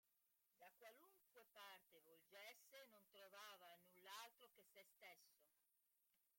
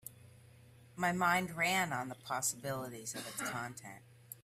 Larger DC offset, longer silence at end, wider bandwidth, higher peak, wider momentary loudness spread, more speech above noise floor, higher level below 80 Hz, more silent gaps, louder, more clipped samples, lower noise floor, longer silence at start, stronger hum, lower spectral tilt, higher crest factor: neither; about the same, 0 s vs 0.05 s; about the same, 16.5 kHz vs 16 kHz; second, -44 dBFS vs -18 dBFS; second, 8 LU vs 21 LU; about the same, 21 dB vs 23 dB; second, under -90 dBFS vs -72 dBFS; neither; second, -64 LUFS vs -36 LUFS; neither; first, -87 dBFS vs -60 dBFS; about the same, 0.05 s vs 0.05 s; neither; second, -0.5 dB/octave vs -3 dB/octave; about the same, 24 dB vs 20 dB